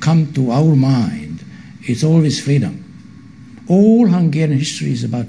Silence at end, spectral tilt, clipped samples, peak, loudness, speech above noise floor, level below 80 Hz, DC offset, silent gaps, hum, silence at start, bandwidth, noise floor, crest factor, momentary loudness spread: 0 s; -7 dB/octave; under 0.1%; -2 dBFS; -14 LUFS; 25 dB; -52 dBFS; 0.3%; none; none; 0 s; 10.5 kHz; -38 dBFS; 14 dB; 16 LU